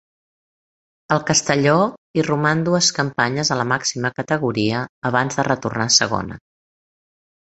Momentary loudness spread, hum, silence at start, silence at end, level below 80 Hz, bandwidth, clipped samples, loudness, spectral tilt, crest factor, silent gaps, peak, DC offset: 7 LU; none; 1.1 s; 1 s; -54 dBFS; 8.2 kHz; under 0.1%; -19 LUFS; -3.5 dB/octave; 20 dB; 1.98-2.14 s, 4.89-5.02 s; -2 dBFS; under 0.1%